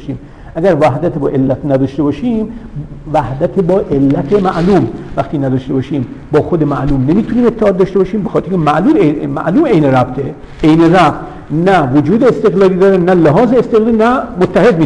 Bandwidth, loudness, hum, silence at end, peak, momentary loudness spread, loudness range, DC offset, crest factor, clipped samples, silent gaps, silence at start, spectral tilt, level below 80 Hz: 10.5 kHz; -11 LUFS; none; 0 s; 0 dBFS; 9 LU; 4 LU; under 0.1%; 10 dB; under 0.1%; none; 0 s; -8.5 dB/octave; -32 dBFS